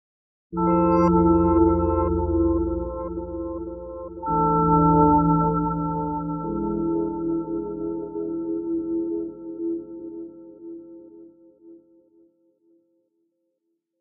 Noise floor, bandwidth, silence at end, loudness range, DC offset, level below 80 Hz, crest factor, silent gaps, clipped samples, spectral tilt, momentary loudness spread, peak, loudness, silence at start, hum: -76 dBFS; 2.8 kHz; 2.25 s; 14 LU; under 0.1%; -38 dBFS; 18 dB; none; under 0.1%; -9 dB/octave; 18 LU; -6 dBFS; -23 LUFS; 0.5 s; 60 Hz at -55 dBFS